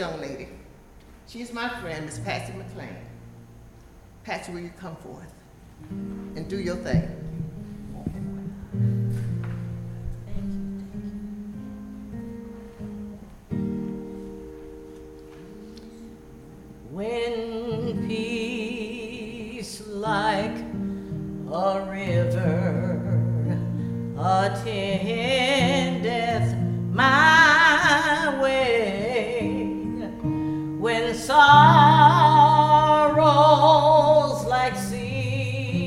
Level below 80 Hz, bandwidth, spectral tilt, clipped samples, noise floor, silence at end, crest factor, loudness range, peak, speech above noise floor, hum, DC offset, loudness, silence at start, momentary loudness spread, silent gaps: -46 dBFS; 14.5 kHz; -5.5 dB/octave; under 0.1%; -48 dBFS; 0 s; 22 dB; 20 LU; -2 dBFS; 17 dB; none; under 0.1%; -21 LUFS; 0 s; 23 LU; none